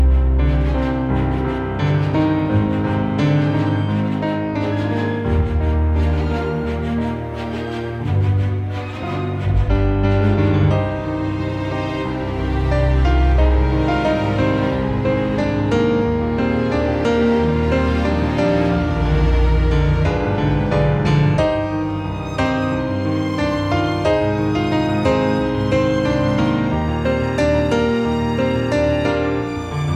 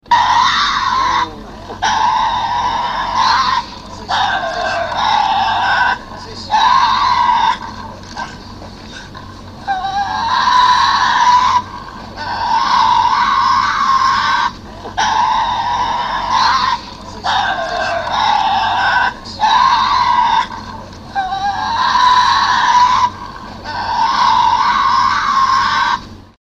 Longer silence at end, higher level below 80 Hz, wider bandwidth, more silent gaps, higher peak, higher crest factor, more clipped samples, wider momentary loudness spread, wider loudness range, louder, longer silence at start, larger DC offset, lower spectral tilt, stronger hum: second, 0 s vs 0.2 s; first, -24 dBFS vs -40 dBFS; about the same, 8.8 kHz vs 9.4 kHz; neither; second, -4 dBFS vs 0 dBFS; about the same, 14 dB vs 14 dB; neither; second, 6 LU vs 18 LU; about the same, 3 LU vs 3 LU; second, -19 LUFS vs -13 LUFS; about the same, 0 s vs 0.1 s; neither; first, -8 dB/octave vs -2 dB/octave; neither